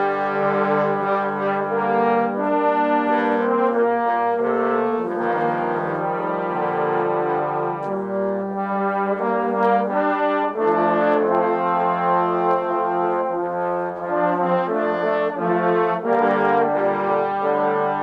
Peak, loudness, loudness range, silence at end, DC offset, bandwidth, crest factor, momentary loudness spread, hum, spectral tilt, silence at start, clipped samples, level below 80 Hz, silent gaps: -8 dBFS; -20 LUFS; 3 LU; 0 s; under 0.1%; 5.8 kHz; 12 dB; 5 LU; none; -8.5 dB/octave; 0 s; under 0.1%; -64 dBFS; none